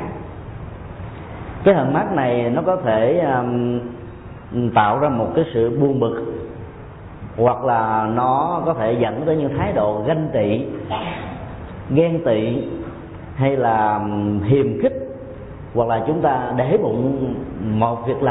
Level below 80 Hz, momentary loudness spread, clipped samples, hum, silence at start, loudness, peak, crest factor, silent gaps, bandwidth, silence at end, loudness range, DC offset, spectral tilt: -44 dBFS; 17 LU; under 0.1%; none; 0 s; -19 LUFS; -4 dBFS; 16 dB; none; 4 kHz; 0 s; 2 LU; under 0.1%; -12.5 dB/octave